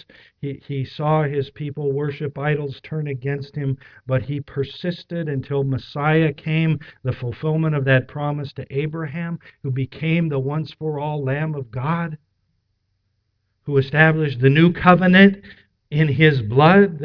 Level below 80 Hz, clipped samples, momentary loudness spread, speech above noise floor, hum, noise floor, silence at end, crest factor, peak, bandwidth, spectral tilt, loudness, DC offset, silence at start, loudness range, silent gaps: -52 dBFS; under 0.1%; 14 LU; 51 dB; none; -71 dBFS; 0 s; 20 dB; 0 dBFS; 5.4 kHz; -9.5 dB/octave; -20 LUFS; under 0.1%; 0.45 s; 10 LU; none